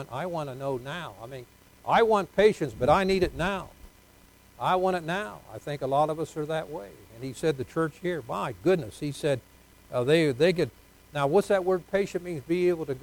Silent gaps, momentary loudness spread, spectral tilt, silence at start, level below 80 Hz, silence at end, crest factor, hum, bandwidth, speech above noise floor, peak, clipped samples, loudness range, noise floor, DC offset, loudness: none; 16 LU; -6 dB/octave; 0 s; -52 dBFS; 0 s; 20 dB; none; 19 kHz; 29 dB; -8 dBFS; under 0.1%; 5 LU; -56 dBFS; under 0.1%; -27 LUFS